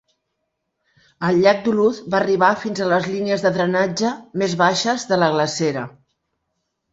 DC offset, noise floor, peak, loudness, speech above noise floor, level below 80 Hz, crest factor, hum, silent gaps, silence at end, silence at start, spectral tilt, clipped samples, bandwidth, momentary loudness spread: under 0.1%; -75 dBFS; -2 dBFS; -19 LUFS; 57 dB; -60 dBFS; 18 dB; none; none; 1.05 s; 1.2 s; -5 dB/octave; under 0.1%; 8 kHz; 7 LU